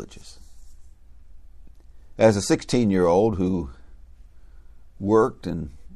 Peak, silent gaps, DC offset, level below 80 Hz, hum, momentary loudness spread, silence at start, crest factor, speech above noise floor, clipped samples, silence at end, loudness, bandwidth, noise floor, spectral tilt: -4 dBFS; none; under 0.1%; -46 dBFS; 60 Hz at -50 dBFS; 15 LU; 0 s; 20 dB; 24 dB; under 0.1%; 0 s; -22 LUFS; 12.5 kHz; -45 dBFS; -6 dB/octave